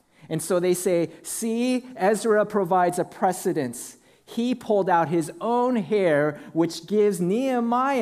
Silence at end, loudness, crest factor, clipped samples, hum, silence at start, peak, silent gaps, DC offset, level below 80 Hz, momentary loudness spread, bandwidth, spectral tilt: 0 s; -24 LUFS; 16 dB; under 0.1%; none; 0.25 s; -8 dBFS; none; under 0.1%; -70 dBFS; 8 LU; 15.5 kHz; -5.5 dB/octave